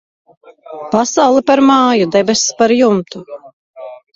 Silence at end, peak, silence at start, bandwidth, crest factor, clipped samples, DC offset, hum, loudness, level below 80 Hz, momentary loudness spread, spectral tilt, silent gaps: 0.2 s; 0 dBFS; 0.7 s; 7.8 kHz; 14 dB; under 0.1%; under 0.1%; none; -12 LUFS; -56 dBFS; 23 LU; -4 dB/octave; 3.53-3.74 s